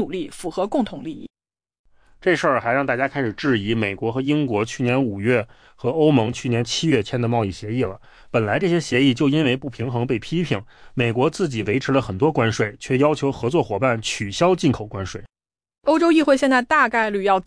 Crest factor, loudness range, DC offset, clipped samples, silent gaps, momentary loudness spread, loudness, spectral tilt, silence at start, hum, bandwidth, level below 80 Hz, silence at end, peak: 16 dB; 2 LU; under 0.1%; under 0.1%; 1.79-1.84 s; 10 LU; -21 LUFS; -6 dB/octave; 0 s; none; 10.5 kHz; -50 dBFS; 0.05 s; -6 dBFS